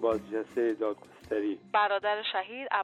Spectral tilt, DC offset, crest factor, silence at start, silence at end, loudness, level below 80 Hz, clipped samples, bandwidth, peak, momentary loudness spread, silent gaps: -5 dB/octave; under 0.1%; 18 dB; 0 s; 0 s; -31 LUFS; -66 dBFS; under 0.1%; 10 kHz; -14 dBFS; 7 LU; none